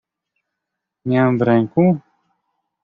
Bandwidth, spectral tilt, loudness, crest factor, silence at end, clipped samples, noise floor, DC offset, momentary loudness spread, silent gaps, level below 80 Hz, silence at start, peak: 4.7 kHz; -8 dB/octave; -17 LUFS; 16 dB; 0.85 s; under 0.1%; -81 dBFS; under 0.1%; 9 LU; none; -58 dBFS; 1.05 s; -2 dBFS